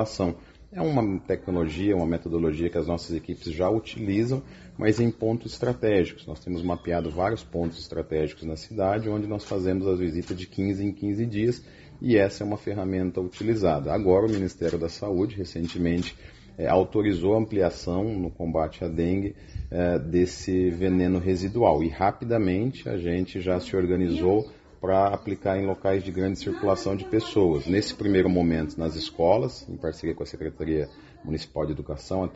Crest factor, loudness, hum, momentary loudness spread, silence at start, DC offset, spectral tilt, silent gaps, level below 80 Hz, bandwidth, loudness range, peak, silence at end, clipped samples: 20 dB; -26 LUFS; none; 10 LU; 0 s; under 0.1%; -6.5 dB/octave; none; -46 dBFS; 8 kHz; 3 LU; -4 dBFS; 0 s; under 0.1%